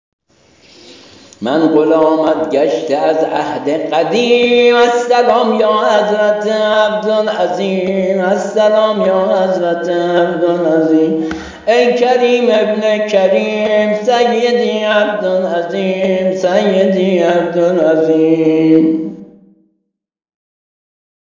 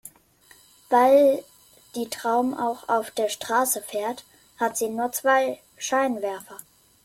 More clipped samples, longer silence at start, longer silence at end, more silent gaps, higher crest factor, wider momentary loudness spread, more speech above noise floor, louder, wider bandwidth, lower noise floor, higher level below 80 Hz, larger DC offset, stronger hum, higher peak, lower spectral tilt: neither; first, 0.9 s vs 0.05 s; first, 2.1 s vs 0.45 s; neither; second, 12 dB vs 18 dB; second, 5 LU vs 15 LU; first, 56 dB vs 33 dB; first, -12 LUFS vs -24 LUFS; second, 7.6 kHz vs 16.5 kHz; first, -68 dBFS vs -56 dBFS; first, -54 dBFS vs -70 dBFS; neither; neither; first, 0 dBFS vs -8 dBFS; first, -5.5 dB/octave vs -2.5 dB/octave